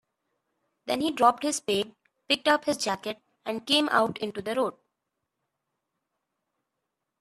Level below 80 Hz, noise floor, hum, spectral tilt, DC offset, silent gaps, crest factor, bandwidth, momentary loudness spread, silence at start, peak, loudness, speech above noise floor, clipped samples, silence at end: -72 dBFS; -83 dBFS; none; -2.5 dB/octave; under 0.1%; none; 24 dB; 14 kHz; 13 LU; 0.85 s; -6 dBFS; -26 LUFS; 57 dB; under 0.1%; 2.5 s